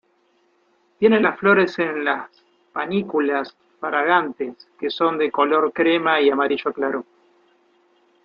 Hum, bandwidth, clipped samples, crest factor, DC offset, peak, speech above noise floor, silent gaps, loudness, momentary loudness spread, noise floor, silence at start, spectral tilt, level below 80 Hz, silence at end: none; 6.8 kHz; under 0.1%; 20 dB; under 0.1%; -2 dBFS; 43 dB; none; -20 LUFS; 13 LU; -63 dBFS; 1 s; -7 dB/octave; -68 dBFS; 1.2 s